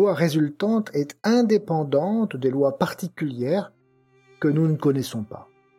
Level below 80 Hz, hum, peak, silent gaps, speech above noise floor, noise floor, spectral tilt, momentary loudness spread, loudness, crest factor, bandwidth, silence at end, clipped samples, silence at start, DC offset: -68 dBFS; none; -4 dBFS; none; 38 dB; -60 dBFS; -7 dB/octave; 9 LU; -23 LUFS; 18 dB; 16 kHz; 0.35 s; under 0.1%; 0 s; under 0.1%